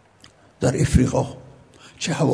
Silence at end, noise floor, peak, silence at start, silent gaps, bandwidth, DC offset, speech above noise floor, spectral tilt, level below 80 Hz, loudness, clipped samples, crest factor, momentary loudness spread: 0 s; -52 dBFS; -2 dBFS; 0.6 s; none; 11 kHz; under 0.1%; 32 dB; -6 dB/octave; -36 dBFS; -22 LUFS; under 0.1%; 20 dB; 12 LU